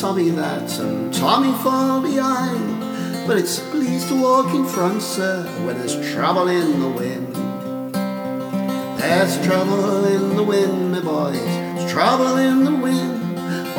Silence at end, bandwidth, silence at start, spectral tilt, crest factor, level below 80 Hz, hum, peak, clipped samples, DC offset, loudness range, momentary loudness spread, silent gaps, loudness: 0 s; 19.5 kHz; 0 s; -5.5 dB/octave; 18 dB; -66 dBFS; none; -2 dBFS; under 0.1%; under 0.1%; 3 LU; 8 LU; none; -20 LUFS